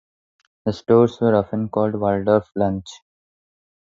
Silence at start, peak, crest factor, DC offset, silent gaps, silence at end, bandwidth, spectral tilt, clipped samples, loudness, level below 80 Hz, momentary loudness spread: 0.65 s; -2 dBFS; 18 dB; under 0.1%; none; 0.9 s; 7.6 kHz; -8 dB/octave; under 0.1%; -20 LUFS; -50 dBFS; 12 LU